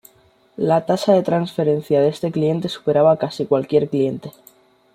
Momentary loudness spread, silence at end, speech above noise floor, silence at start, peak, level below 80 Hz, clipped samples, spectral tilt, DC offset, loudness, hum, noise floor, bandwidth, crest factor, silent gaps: 6 LU; 0.65 s; 37 dB; 0.6 s; -2 dBFS; -60 dBFS; under 0.1%; -7 dB/octave; under 0.1%; -19 LUFS; none; -55 dBFS; 15.5 kHz; 16 dB; none